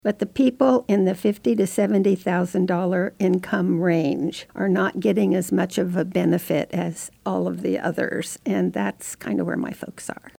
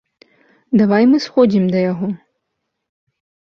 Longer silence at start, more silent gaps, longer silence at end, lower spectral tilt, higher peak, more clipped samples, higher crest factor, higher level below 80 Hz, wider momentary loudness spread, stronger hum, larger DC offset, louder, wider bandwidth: second, 0.05 s vs 0.7 s; neither; second, 0.1 s vs 1.35 s; about the same, -6.5 dB/octave vs -7.5 dB/octave; second, -6 dBFS vs -2 dBFS; neither; about the same, 16 dB vs 16 dB; about the same, -62 dBFS vs -58 dBFS; second, 8 LU vs 11 LU; neither; neither; second, -22 LUFS vs -15 LUFS; first, 20 kHz vs 6.8 kHz